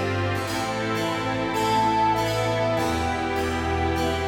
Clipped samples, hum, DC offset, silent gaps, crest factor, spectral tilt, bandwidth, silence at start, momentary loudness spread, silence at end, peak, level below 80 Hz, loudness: under 0.1%; none; under 0.1%; none; 12 dB; -5 dB/octave; 18 kHz; 0 s; 4 LU; 0 s; -12 dBFS; -40 dBFS; -24 LUFS